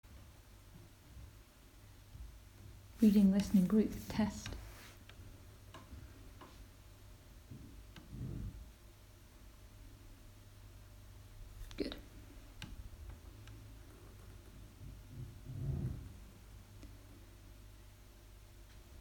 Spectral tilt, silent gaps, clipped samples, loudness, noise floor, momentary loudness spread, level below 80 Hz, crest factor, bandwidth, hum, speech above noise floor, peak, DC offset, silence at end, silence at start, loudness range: -7 dB/octave; none; under 0.1%; -36 LUFS; -60 dBFS; 26 LU; -56 dBFS; 22 dB; 19 kHz; none; 28 dB; -18 dBFS; under 0.1%; 0 s; 0.05 s; 20 LU